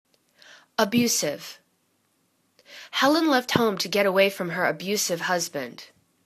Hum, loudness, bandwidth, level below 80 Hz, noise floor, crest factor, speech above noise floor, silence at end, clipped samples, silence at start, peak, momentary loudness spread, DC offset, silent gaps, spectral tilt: none; -23 LUFS; 14 kHz; -68 dBFS; -69 dBFS; 24 dB; 46 dB; 0.4 s; under 0.1%; 0.8 s; -2 dBFS; 16 LU; under 0.1%; none; -3 dB/octave